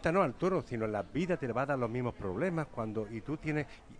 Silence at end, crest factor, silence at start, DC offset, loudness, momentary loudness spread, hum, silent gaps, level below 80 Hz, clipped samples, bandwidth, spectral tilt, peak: 0 s; 18 dB; 0 s; under 0.1%; -35 LUFS; 7 LU; none; none; -56 dBFS; under 0.1%; 10.5 kHz; -7.5 dB/octave; -16 dBFS